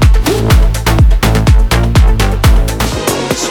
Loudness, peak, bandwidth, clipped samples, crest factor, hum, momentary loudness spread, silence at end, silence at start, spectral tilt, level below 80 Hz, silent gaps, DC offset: -11 LUFS; 0 dBFS; 18.5 kHz; under 0.1%; 8 dB; none; 5 LU; 0 s; 0 s; -5 dB/octave; -10 dBFS; none; under 0.1%